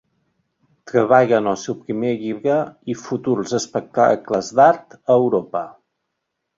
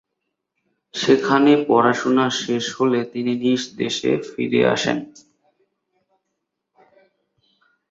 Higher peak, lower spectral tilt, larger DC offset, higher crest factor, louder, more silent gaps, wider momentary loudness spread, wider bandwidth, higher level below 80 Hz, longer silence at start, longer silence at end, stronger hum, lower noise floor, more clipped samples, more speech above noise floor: about the same, -2 dBFS vs -2 dBFS; about the same, -5.5 dB/octave vs -4.5 dB/octave; neither; about the same, 18 dB vs 20 dB; about the same, -19 LUFS vs -19 LUFS; neither; first, 12 LU vs 9 LU; about the same, 7.6 kHz vs 7.8 kHz; about the same, -62 dBFS vs -64 dBFS; about the same, 0.85 s vs 0.95 s; second, 0.9 s vs 2.8 s; neither; about the same, -77 dBFS vs -78 dBFS; neither; about the same, 59 dB vs 59 dB